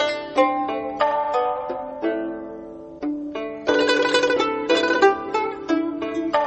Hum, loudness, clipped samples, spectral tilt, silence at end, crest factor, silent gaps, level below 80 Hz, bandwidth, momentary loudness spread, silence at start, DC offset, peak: none; -22 LUFS; under 0.1%; -3.5 dB/octave; 0 s; 18 dB; none; -58 dBFS; 8.4 kHz; 12 LU; 0 s; under 0.1%; -4 dBFS